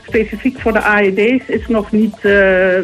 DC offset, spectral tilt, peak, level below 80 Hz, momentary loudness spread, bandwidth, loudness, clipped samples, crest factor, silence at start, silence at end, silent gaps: under 0.1%; -6.5 dB/octave; -2 dBFS; -36 dBFS; 7 LU; 13.5 kHz; -13 LUFS; under 0.1%; 10 dB; 0.1 s; 0 s; none